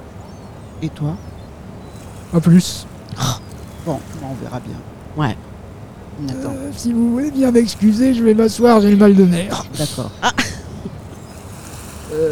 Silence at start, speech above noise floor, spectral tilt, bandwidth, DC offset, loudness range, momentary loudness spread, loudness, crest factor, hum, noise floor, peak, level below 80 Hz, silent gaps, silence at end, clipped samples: 0 s; 20 dB; -6 dB/octave; 17 kHz; 0.2%; 12 LU; 24 LU; -16 LUFS; 16 dB; none; -35 dBFS; -2 dBFS; -40 dBFS; none; 0 s; under 0.1%